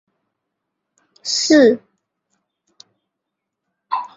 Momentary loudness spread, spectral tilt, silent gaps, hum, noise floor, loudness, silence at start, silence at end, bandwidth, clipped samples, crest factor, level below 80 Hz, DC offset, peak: 15 LU; -2.5 dB/octave; none; none; -80 dBFS; -15 LUFS; 1.25 s; 0.1 s; 8 kHz; under 0.1%; 20 dB; -66 dBFS; under 0.1%; -2 dBFS